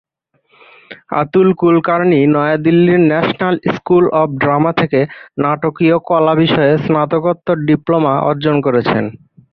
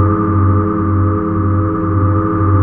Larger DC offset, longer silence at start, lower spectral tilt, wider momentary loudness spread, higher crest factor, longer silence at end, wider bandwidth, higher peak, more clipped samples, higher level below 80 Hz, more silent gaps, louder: neither; first, 0.9 s vs 0 s; second, -9.5 dB/octave vs -13.5 dB/octave; first, 6 LU vs 2 LU; about the same, 12 dB vs 12 dB; first, 0.35 s vs 0 s; first, 5.8 kHz vs 2.4 kHz; about the same, 0 dBFS vs -2 dBFS; neither; second, -52 dBFS vs -34 dBFS; neither; about the same, -13 LUFS vs -14 LUFS